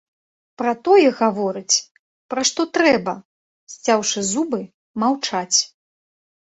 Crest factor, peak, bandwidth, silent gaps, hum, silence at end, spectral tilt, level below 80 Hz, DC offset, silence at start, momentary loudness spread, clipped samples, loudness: 18 dB; -2 dBFS; 8.4 kHz; 1.91-2.29 s, 3.25-3.67 s, 4.74-4.94 s; none; 0.8 s; -2.5 dB/octave; -66 dBFS; under 0.1%; 0.6 s; 13 LU; under 0.1%; -19 LUFS